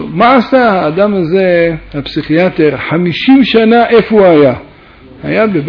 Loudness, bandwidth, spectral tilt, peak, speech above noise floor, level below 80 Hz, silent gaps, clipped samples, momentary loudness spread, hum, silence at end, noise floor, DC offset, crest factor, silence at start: -9 LUFS; 5.4 kHz; -8.5 dB/octave; 0 dBFS; 28 dB; -40 dBFS; none; 0.3%; 10 LU; none; 0 s; -36 dBFS; under 0.1%; 8 dB; 0 s